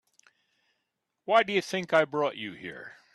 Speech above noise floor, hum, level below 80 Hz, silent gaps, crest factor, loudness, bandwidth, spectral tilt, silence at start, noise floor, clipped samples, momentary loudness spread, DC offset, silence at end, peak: 54 dB; none; -76 dBFS; none; 22 dB; -27 LUFS; 12.5 kHz; -4.5 dB/octave; 1.3 s; -82 dBFS; under 0.1%; 18 LU; under 0.1%; 0.25 s; -8 dBFS